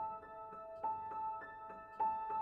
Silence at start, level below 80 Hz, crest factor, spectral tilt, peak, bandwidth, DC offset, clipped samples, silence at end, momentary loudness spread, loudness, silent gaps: 0 s; -74 dBFS; 14 dB; -7 dB/octave; -28 dBFS; 4.7 kHz; under 0.1%; under 0.1%; 0 s; 12 LU; -44 LUFS; none